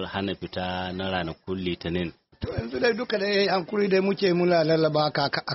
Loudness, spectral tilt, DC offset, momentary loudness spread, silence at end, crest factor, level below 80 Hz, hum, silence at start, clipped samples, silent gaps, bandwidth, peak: -25 LUFS; -4 dB/octave; under 0.1%; 10 LU; 0 s; 16 dB; -52 dBFS; none; 0 s; under 0.1%; none; 6 kHz; -10 dBFS